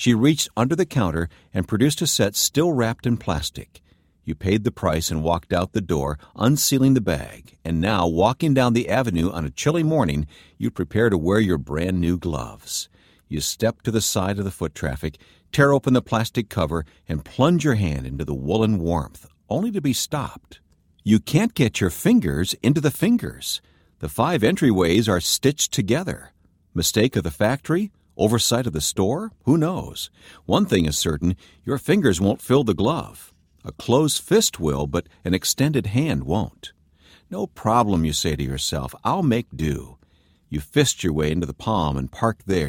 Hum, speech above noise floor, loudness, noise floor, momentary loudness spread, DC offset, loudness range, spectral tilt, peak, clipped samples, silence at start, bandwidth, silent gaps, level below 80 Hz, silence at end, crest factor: none; 37 dB; -22 LUFS; -58 dBFS; 12 LU; under 0.1%; 3 LU; -5 dB/octave; -2 dBFS; under 0.1%; 0 s; 17.5 kHz; none; -40 dBFS; 0 s; 20 dB